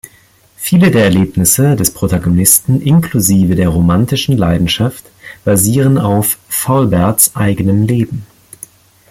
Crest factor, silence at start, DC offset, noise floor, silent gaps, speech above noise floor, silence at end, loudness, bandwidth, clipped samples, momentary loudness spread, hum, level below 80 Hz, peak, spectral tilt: 12 dB; 0.6 s; under 0.1%; -47 dBFS; none; 36 dB; 0.85 s; -11 LUFS; 17 kHz; under 0.1%; 7 LU; none; -36 dBFS; 0 dBFS; -5 dB/octave